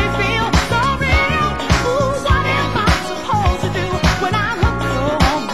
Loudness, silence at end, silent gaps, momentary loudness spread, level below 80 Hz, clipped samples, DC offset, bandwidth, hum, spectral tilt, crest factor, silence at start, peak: -16 LUFS; 0 s; none; 3 LU; -24 dBFS; under 0.1%; 2%; 16 kHz; none; -5 dB/octave; 16 dB; 0 s; 0 dBFS